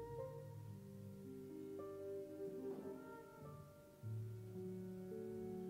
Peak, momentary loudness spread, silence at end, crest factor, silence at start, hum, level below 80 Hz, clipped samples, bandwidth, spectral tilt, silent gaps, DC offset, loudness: -38 dBFS; 7 LU; 0 s; 12 dB; 0 s; none; -76 dBFS; under 0.1%; 16 kHz; -8.5 dB/octave; none; under 0.1%; -52 LUFS